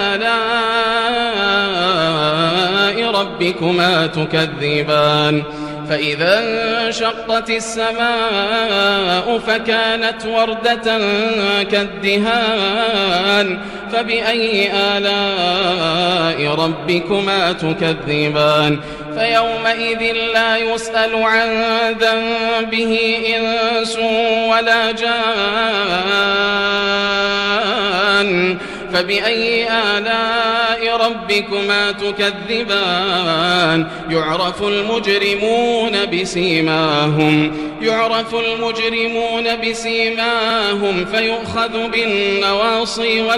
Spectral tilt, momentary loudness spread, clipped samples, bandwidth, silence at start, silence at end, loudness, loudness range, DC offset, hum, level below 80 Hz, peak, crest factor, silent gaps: -4.5 dB/octave; 4 LU; under 0.1%; 15 kHz; 0 s; 0 s; -15 LUFS; 1 LU; under 0.1%; none; -46 dBFS; -2 dBFS; 14 dB; none